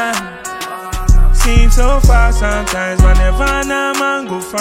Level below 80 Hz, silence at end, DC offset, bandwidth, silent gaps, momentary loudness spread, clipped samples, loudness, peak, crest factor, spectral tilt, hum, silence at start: -12 dBFS; 0 s; under 0.1%; 15.5 kHz; none; 11 LU; under 0.1%; -14 LUFS; 0 dBFS; 10 dB; -4.5 dB/octave; none; 0 s